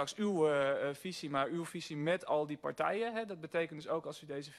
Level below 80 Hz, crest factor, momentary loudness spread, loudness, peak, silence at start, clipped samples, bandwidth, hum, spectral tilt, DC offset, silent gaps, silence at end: -78 dBFS; 16 dB; 10 LU; -36 LUFS; -20 dBFS; 0 s; under 0.1%; 13 kHz; none; -5 dB/octave; under 0.1%; none; 0 s